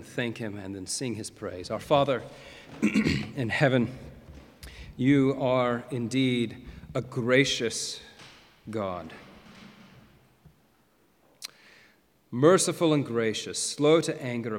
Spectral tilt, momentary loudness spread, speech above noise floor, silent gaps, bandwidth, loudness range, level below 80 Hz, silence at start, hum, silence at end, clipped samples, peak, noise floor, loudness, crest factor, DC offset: -5 dB/octave; 22 LU; 38 dB; none; 16.5 kHz; 15 LU; -56 dBFS; 0 s; none; 0 s; under 0.1%; -6 dBFS; -65 dBFS; -27 LUFS; 22 dB; under 0.1%